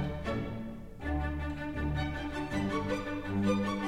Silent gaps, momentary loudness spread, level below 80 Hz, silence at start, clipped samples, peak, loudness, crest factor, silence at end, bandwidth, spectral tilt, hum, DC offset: none; 8 LU; -42 dBFS; 0 s; under 0.1%; -18 dBFS; -35 LUFS; 16 dB; 0 s; 14.5 kHz; -7 dB/octave; none; 0.3%